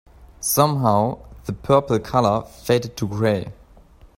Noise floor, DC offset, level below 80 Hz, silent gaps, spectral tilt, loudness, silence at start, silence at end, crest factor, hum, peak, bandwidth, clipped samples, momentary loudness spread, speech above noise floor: -48 dBFS; under 0.1%; -46 dBFS; none; -5.5 dB/octave; -20 LUFS; 0.2 s; 0.1 s; 20 dB; none; -2 dBFS; 16.5 kHz; under 0.1%; 13 LU; 28 dB